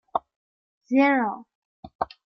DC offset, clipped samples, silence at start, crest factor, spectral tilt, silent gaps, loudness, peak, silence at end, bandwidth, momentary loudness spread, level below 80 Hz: under 0.1%; under 0.1%; 0.15 s; 20 dB; -6.5 dB/octave; 0.36-0.81 s, 1.55-1.83 s, 1.95-1.99 s; -24 LUFS; -8 dBFS; 0.3 s; 6.2 kHz; 13 LU; -64 dBFS